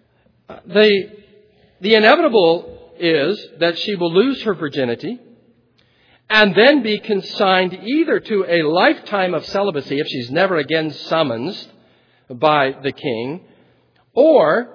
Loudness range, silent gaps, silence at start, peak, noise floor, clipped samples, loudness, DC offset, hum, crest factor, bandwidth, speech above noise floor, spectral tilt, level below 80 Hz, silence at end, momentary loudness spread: 5 LU; none; 0.5 s; 0 dBFS; -57 dBFS; under 0.1%; -16 LUFS; under 0.1%; none; 18 dB; 5.4 kHz; 41 dB; -6.5 dB/octave; -62 dBFS; 0.05 s; 12 LU